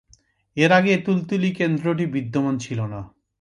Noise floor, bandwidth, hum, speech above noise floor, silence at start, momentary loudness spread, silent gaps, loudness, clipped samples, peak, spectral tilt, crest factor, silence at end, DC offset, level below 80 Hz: -58 dBFS; 10.5 kHz; none; 38 dB; 0.55 s; 12 LU; none; -21 LUFS; under 0.1%; -4 dBFS; -6.5 dB/octave; 18 dB; 0.3 s; under 0.1%; -58 dBFS